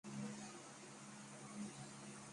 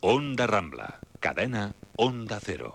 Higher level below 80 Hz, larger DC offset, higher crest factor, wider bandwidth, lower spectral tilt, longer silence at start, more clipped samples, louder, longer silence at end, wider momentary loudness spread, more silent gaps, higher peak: second, -84 dBFS vs -56 dBFS; neither; about the same, 16 dB vs 18 dB; about the same, 11.5 kHz vs 12.5 kHz; second, -4 dB/octave vs -5.5 dB/octave; about the same, 0.05 s vs 0 s; neither; second, -53 LUFS vs -29 LUFS; about the same, 0 s vs 0 s; second, 6 LU vs 13 LU; neither; second, -38 dBFS vs -10 dBFS